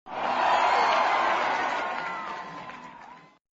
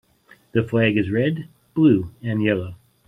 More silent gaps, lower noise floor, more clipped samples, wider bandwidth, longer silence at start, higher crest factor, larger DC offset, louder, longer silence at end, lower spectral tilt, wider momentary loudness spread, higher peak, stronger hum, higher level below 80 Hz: neither; second, -49 dBFS vs -54 dBFS; neither; first, 7.6 kHz vs 4 kHz; second, 0.05 s vs 0.55 s; about the same, 16 dB vs 16 dB; neither; second, -25 LUFS vs -21 LUFS; about the same, 0.35 s vs 0.3 s; second, 0.5 dB/octave vs -9 dB/octave; first, 19 LU vs 11 LU; second, -12 dBFS vs -4 dBFS; neither; second, -66 dBFS vs -54 dBFS